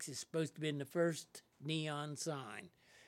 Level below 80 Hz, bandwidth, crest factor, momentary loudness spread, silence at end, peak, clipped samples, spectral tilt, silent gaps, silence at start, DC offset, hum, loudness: -88 dBFS; 16.5 kHz; 18 dB; 14 LU; 0 s; -24 dBFS; under 0.1%; -4.5 dB/octave; none; 0 s; under 0.1%; none; -41 LUFS